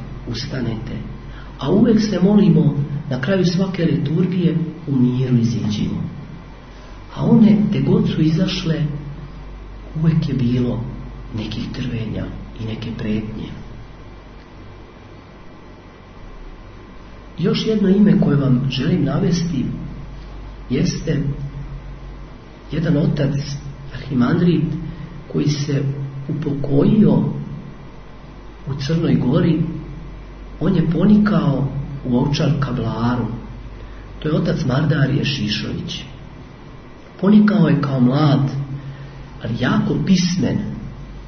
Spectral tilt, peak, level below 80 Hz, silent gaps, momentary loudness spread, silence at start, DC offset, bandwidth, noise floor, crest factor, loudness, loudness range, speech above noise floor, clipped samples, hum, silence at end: -7.5 dB/octave; -2 dBFS; -38 dBFS; none; 23 LU; 0 s; under 0.1%; 6.6 kHz; -40 dBFS; 18 dB; -18 LUFS; 8 LU; 23 dB; under 0.1%; none; 0 s